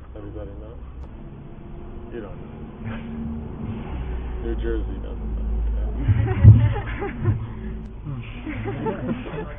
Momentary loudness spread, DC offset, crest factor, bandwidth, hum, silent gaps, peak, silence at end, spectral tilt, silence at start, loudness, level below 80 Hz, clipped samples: 20 LU; under 0.1%; 24 dB; 3.6 kHz; none; none; 0 dBFS; 0 s; -12 dB/octave; 0 s; -24 LUFS; -30 dBFS; under 0.1%